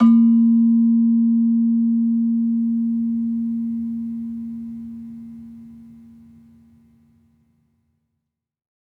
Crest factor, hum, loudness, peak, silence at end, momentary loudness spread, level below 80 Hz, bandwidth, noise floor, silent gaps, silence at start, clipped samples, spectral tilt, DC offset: 14 dB; none; -18 LUFS; -4 dBFS; 2.95 s; 20 LU; -66 dBFS; 3 kHz; -79 dBFS; none; 0 s; under 0.1%; -10.5 dB/octave; under 0.1%